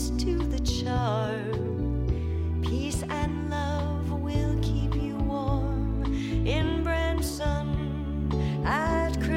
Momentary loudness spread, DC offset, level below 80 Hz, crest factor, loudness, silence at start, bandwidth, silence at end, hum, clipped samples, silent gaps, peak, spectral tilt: 3 LU; under 0.1%; -32 dBFS; 12 dB; -28 LUFS; 0 s; 16 kHz; 0 s; none; under 0.1%; none; -16 dBFS; -6.5 dB/octave